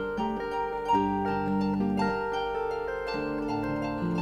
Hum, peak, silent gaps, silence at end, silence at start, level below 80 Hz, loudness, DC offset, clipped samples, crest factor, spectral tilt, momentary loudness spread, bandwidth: none; -14 dBFS; none; 0 s; 0 s; -50 dBFS; -29 LUFS; under 0.1%; under 0.1%; 16 dB; -7.5 dB/octave; 5 LU; 11 kHz